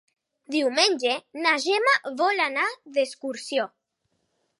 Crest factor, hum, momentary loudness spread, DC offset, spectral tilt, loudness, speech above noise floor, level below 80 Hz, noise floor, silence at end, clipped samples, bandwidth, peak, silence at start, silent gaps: 20 dB; none; 8 LU; under 0.1%; -0.5 dB/octave; -24 LUFS; 51 dB; -86 dBFS; -75 dBFS; 0.95 s; under 0.1%; 11.5 kHz; -6 dBFS; 0.5 s; none